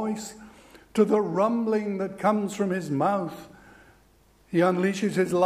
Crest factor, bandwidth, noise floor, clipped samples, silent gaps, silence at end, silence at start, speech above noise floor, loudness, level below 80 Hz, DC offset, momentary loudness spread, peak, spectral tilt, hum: 18 dB; 15 kHz; -59 dBFS; under 0.1%; none; 0 s; 0 s; 35 dB; -26 LUFS; -64 dBFS; under 0.1%; 10 LU; -8 dBFS; -6.5 dB/octave; none